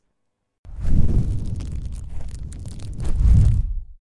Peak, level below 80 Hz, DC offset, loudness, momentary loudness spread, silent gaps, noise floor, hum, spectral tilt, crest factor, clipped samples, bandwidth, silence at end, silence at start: -4 dBFS; -22 dBFS; under 0.1%; -23 LUFS; 18 LU; none; -75 dBFS; none; -8.5 dB/octave; 16 dB; under 0.1%; 10.5 kHz; 0.2 s; 0.65 s